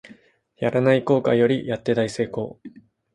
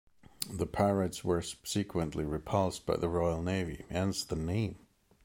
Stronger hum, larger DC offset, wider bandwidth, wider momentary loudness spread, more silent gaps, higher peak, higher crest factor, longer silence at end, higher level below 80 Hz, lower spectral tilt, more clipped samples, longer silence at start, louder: neither; neither; second, 11.5 kHz vs 16.5 kHz; about the same, 9 LU vs 7 LU; neither; first, -4 dBFS vs -12 dBFS; about the same, 18 dB vs 22 dB; about the same, 0.45 s vs 0.45 s; second, -60 dBFS vs -50 dBFS; first, -7 dB/octave vs -5.5 dB/octave; neither; second, 0.05 s vs 0.4 s; first, -21 LUFS vs -34 LUFS